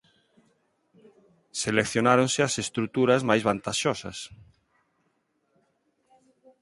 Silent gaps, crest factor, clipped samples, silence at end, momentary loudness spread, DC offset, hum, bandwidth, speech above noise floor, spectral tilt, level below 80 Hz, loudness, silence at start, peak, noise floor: none; 24 dB; under 0.1%; 2.25 s; 15 LU; under 0.1%; none; 11.5 kHz; 48 dB; -4 dB/octave; -62 dBFS; -25 LUFS; 1.55 s; -4 dBFS; -73 dBFS